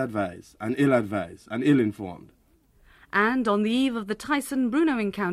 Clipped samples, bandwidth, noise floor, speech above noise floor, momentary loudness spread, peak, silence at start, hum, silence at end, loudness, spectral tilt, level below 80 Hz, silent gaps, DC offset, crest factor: under 0.1%; 14 kHz; -60 dBFS; 36 dB; 11 LU; -8 dBFS; 0 s; none; 0 s; -25 LUFS; -6 dB/octave; -60 dBFS; none; under 0.1%; 18 dB